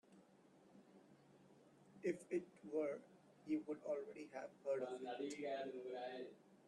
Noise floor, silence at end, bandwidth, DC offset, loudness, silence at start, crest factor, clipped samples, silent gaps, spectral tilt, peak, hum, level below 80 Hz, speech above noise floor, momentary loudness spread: -70 dBFS; 0 s; 11.5 kHz; under 0.1%; -47 LUFS; 0.1 s; 18 dB; under 0.1%; none; -5.5 dB/octave; -30 dBFS; none; under -90 dBFS; 23 dB; 23 LU